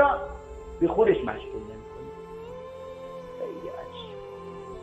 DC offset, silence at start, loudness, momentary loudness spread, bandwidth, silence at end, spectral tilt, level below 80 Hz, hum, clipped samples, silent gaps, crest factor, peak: under 0.1%; 0 s; -30 LUFS; 19 LU; 8.8 kHz; 0 s; -7.5 dB/octave; -48 dBFS; none; under 0.1%; none; 22 dB; -8 dBFS